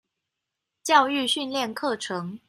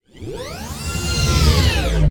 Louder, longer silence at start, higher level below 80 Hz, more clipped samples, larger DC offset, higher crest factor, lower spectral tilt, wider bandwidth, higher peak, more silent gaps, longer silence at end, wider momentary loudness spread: second, -24 LUFS vs -18 LUFS; first, 0.85 s vs 0.15 s; second, -78 dBFS vs -22 dBFS; neither; neither; about the same, 20 dB vs 16 dB; second, -3 dB/octave vs -4.5 dB/octave; second, 14.5 kHz vs 19.5 kHz; second, -6 dBFS vs -2 dBFS; neither; about the same, 0.1 s vs 0 s; second, 11 LU vs 15 LU